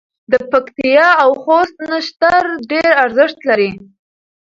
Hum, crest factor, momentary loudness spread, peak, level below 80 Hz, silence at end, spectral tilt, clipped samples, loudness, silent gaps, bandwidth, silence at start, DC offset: none; 14 dB; 8 LU; 0 dBFS; -54 dBFS; 0.65 s; -5 dB/octave; under 0.1%; -13 LUFS; none; 7.6 kHz; 0.3 s; under 0.1%